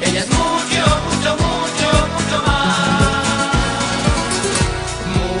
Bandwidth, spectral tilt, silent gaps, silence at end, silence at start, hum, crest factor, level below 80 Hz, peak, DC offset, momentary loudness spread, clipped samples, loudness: 11 kHz; -4 dB/octave; none; 0 s; 0 s; none; 16 dB; -26 dBFS; 0 dBFS; under 0.1%; 3 LU; under 0.1%; -16 LUFS